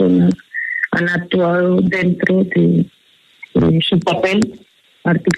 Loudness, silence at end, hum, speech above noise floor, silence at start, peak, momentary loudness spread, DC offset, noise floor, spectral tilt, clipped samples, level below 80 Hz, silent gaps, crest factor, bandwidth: -16 LUFS; 0 s; none; 28 dB; 0 s; 0 dBFS; 7 LU; under 0.1%; -42 dBFS; -7 dB/octave; under 0.1%; -46 dBFS; none; 14 dB; 10.5 kHz